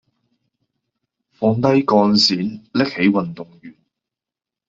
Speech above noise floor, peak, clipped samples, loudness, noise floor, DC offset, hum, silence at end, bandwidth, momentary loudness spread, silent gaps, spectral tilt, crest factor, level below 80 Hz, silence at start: 71 dB; -2 dBFS; under 0.1%; -17 LUFS; -88 dBFS; under 0.1%; none; 0.95 s; 7.6 kHz; 14 LU; none; -5.5 dB/octave; 18 dB; -58 dBFS; 1.4 s